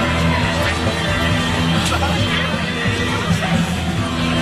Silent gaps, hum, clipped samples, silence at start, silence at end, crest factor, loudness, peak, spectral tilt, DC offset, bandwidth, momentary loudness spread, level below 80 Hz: none; none; under 0.1%; 0 s; 0 s; 12 dB; -18 LUFS; -4 dBFS; -5 dB/octave; under 0.1%; 14 kHz; 3 LU; -30 dBFS